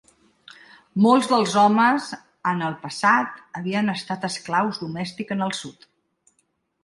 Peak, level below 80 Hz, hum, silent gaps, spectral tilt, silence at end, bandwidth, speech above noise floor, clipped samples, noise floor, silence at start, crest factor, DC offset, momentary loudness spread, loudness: -4 dBFS; -68 dBFS; none; none; -5 dB/octave; 1.1 s; 11.5 kHz; 49 dB; under 0.1%; -70 dBFS; 0.95 s; 18 dB; under 0.1%; 14 LU; -22 LUFS